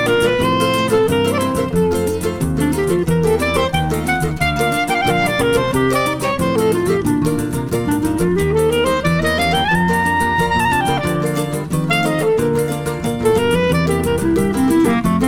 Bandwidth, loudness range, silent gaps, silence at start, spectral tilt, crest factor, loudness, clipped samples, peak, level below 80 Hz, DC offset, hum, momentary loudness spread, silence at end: 17.5 kHz; 1 LU; none; 0 s; -5.5 dB/octave; 14 dB; -16 LUFS; under 0.1%; -2 dBFS; -34 dBFS; under 0.1%; none; 4 LU; 0 s